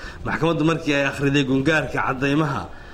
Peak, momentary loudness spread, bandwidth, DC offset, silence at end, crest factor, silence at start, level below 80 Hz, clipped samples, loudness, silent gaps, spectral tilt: -6 dBFS; 5 LU; 13 kHz; under 0.1%; 0 s; 16 dB; 0 s; -42 dBFS; under 0.1%; -21 LUFS; none; -6 dB/octave